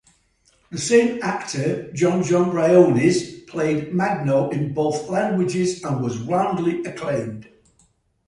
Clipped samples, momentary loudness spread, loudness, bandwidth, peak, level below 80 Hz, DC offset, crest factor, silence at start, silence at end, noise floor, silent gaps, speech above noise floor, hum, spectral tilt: under 0.1%; 10 LU; -21 LUFS; 11.5 kHz; -2 dBFS; -58 dBFS; under 0.1%; 18 dB; 0.7 s; 0.85 s; -62 dBFS; none; 42 dB; none; -6 dB/octave